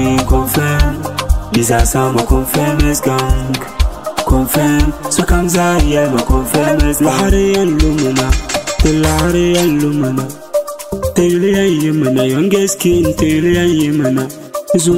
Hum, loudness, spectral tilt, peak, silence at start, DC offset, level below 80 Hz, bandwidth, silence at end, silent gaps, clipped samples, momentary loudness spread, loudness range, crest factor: none; -13 LUFS; -5 dB/octave; 0 dBFS; 0 s; 0.7%; -20 dBFS; 16.5 kHz; 0 s; none; under 0.1%; 6 LU; 2 LU; 12 dB